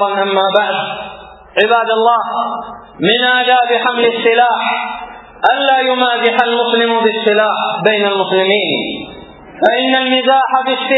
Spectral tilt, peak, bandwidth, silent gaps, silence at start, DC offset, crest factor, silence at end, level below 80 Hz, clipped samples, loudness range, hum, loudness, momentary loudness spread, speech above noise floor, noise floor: -6 dB/octave; 0 dBFS; 6 kHz; none; 0 s; under 0.1%; 14 dB; 0 s; -54 dBFS; under 0.1%; 1 LU; none; -13 LUFS; 11 LU; 21 dB; -34 dBFS